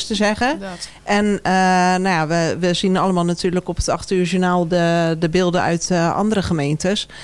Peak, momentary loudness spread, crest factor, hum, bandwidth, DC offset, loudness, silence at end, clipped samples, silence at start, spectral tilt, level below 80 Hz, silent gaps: -2 dBFS; 5 LU; 16 dB; none; 11.5 kHz; under 0.1%; -18 LUFS; 0 s; under 0.1%; 0 s; -5 dB/octave; -40 dBFS; none